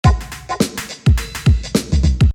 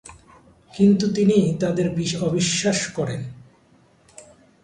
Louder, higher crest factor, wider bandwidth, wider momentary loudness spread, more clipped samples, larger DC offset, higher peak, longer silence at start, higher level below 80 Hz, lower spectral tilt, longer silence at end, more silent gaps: first, -18 LUFS vs -21 LUFS; about the same, 16 dB vs 18 dB; first, 17 kHz vs 10.5 kHz; second, 5 LU vs 11 LU; neither; neither; first, 0 dBFS vs -6 dBFS; about the same, 0.05 s vs 0.05 s; first, -20 dBFS vs -54 dBFS; about the same, -6 dB/octave vs -5 dB/octave; second, 0 s vs 0.4 s; neither